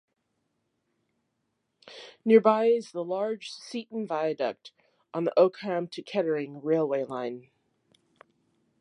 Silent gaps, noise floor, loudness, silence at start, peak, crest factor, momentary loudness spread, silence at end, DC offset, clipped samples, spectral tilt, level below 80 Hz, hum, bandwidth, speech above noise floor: none; -78 dBFS; -27 LUFS; 1.85 s; -6 dBFS; 22 dB; 16 LU; 1.4 s; under 0.1%; under 0.1%; -6.5 dB/octave; -84 dBFS; none; 10.5 kHz; 52 dB